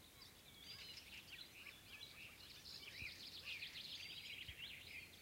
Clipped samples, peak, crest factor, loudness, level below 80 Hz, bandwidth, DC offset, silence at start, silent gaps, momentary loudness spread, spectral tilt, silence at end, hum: under 0.1%; -40 dBFS; 16 dB; -53 LUFS; -74 dBFS; 16 kHz; under 0.1%; 0 s; none; 7 LU; -1.5 dB/octave; 0 s; none